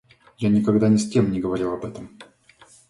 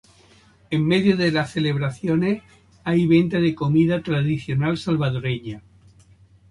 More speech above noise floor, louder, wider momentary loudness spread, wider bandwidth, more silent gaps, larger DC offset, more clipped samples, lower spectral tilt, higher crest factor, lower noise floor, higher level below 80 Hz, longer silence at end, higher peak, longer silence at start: about the same, 32 dB vs 33 dB; about the same, -21 LUFS vs -21 LUFS; first, 17 LU vs 10 LU; about the same, 11.5 kHz vs 11.5 kHz; neither; neither; neither; about the same, -7 dB/octave vs -7.5 dB/octave; about the same, 18 dB vs 16 dB; about the same, -53 dBFS vs -53 dBFS; about the same, -52 dBFS vs -52 dBFS; second, 0.65 s vs 0.9 s; about the same, -4 dBFS vs -4 dBFS; second, 0.4 s vs 0.7 s